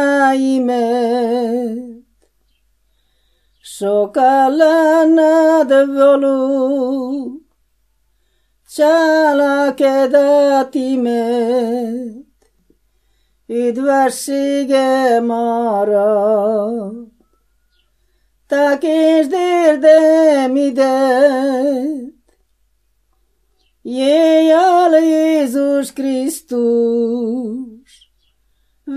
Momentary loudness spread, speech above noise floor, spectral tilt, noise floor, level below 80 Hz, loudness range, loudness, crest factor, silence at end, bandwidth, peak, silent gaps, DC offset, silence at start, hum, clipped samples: 13 LU; 50 dB; -4.5 dB/octave; -63 dBFS; -62 dBFS; 7 LU; -14 LUFS; 14 dB; 0 s; 15 kHz; 0 dBFS; none; under 0.1%; 0 s; none; under 0.1%